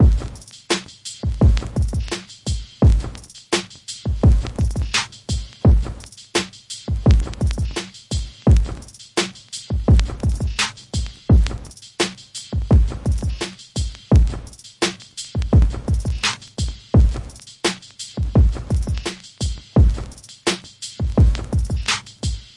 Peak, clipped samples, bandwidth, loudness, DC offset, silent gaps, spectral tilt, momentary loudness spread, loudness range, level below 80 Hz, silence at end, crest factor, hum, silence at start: 0 dBFS; under 0.1%; 11.5 kHz; -21 LUFS; under 0.1%; none; -5.5 dB/octave; 14 LU; 1 LU; -22 dBFS; 0.15 s; 18 dB; none; 0 s